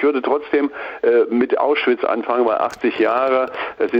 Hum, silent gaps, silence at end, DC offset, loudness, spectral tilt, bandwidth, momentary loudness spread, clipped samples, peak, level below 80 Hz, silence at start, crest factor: none; none; 0 s; under 0.1%; -18 LUFS; -5.5 dB/octave; 7.8 kHz; 5 LU; under 0.1%; -4 dBFS; -60 dBFS; 0 s; 12 dB